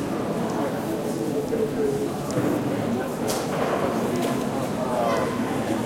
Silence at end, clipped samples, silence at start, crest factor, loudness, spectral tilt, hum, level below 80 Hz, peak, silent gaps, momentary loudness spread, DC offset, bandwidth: 0 s; under 0.1%; 0 s; 16 dB; -25 LUFS; -5.5 dB/octave; none; -54 dBFS; -10 dBFS; none; 3 LU; under 0.1%; 16.5 kHz